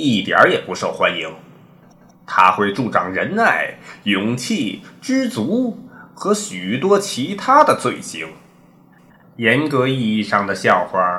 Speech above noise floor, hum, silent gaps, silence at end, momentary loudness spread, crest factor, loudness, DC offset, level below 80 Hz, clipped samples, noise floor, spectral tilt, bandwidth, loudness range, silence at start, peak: 31 dB; none; none; 0 s; 13 LU; 18 dB; -17 LUFS; under 0.1%; -62 dBFS; under 0.1%; -49 dBFS; -4.5 dB/octave; 15 kHz; 3 LU; 0 s; 0 dBFS